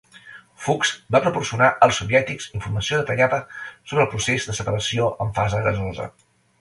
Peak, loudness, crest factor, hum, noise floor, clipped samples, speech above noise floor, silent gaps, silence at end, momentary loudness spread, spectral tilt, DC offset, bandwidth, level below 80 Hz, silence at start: 0 dBFS; -21 LUFS; 20 dB; none; -45 dBFS; under 0.1%; 24 dB; none; 0.5 s; 12 LU; -4.5 dB/octave; under 0.1%; 11.5 kHz; -46 dBFS; 0.15 s